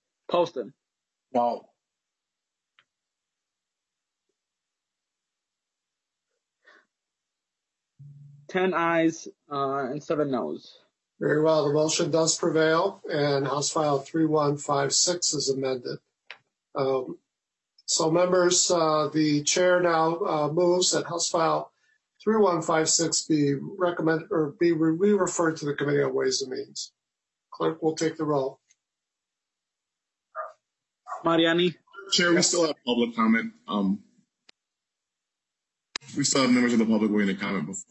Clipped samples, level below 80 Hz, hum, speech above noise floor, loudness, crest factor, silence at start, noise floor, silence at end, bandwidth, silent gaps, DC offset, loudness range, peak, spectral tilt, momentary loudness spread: under 0.1%; -74 dBFS; none; 63 dB; -25 LUFS; 18 dB; 0.3 s; -87 dBFS; 0.05 s; 8.6 kHz; none; under 0.1%; 9 LU; -10 dBFS; -3.5 dB/octave; 13 LU